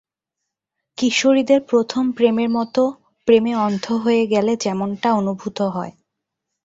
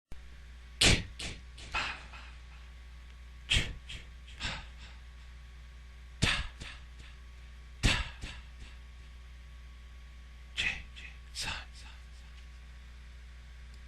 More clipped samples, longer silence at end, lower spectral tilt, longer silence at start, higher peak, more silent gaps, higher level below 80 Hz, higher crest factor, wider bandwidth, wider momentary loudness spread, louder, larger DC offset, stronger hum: neither; first, 0.75 s vs 0 s; first, -5 dB/octave vs -2.5 dB/octave; first, 1 s vs 0.1 s; first, -2 dBFS vs -6 dBFS; neither; second, -62 dBFS vs -44 dBFS; second, 18 dB vs 32 dB; second, 8 kHz vs 13 kHz; second, 8 LU vs 22 LU; first, -19 LUFS vs -33 LUFS; neither; neither